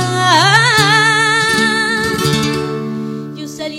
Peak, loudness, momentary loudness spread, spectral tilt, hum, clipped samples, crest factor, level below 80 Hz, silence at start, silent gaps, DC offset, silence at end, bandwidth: 0 dBFS; -12 LUFS; 15 LU; -3.5 dB/octave; none; under 0.1%; 14 dB; -46 dBFS; 0 s; none; under 0.1%; 0 s; 16.5 kHz